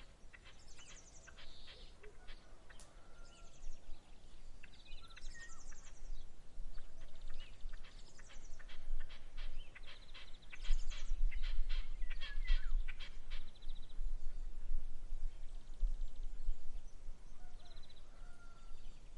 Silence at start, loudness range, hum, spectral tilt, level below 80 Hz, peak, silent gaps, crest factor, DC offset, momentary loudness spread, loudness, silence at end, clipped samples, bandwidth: 0 s; 13 LU; none; -3.5 dB/octave; -42 dBFS; -20 dBFS; none; 18 dB; under 0.1%; 15 LU; -52 LUFS; 0 s; under 0.1%; 7.8 kHz